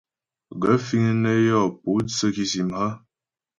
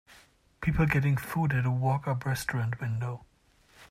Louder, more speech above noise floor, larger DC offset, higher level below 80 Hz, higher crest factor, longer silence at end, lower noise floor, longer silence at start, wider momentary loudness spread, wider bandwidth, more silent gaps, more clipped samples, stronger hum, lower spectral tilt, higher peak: first, -22 LUFS vs -29 LUFS; first, 69 dB vs 35 dB; neither; second, -56 dBFS vs -48 dBFS; about the same, 18 dB vs 16 dB; first, 0.6 s vs 0.05 s; first, -90 dBFS vs -63 dBFS; about the same, 0.5 s vs 0.6 s; about the same, 9 LU vs 8 LU; second, 9 kHz vs 16 kHz; neither; neither; neither; second, -5.5 dB/octave vs -7 dB/octave; first, -6 dBFS vs -12 dBFS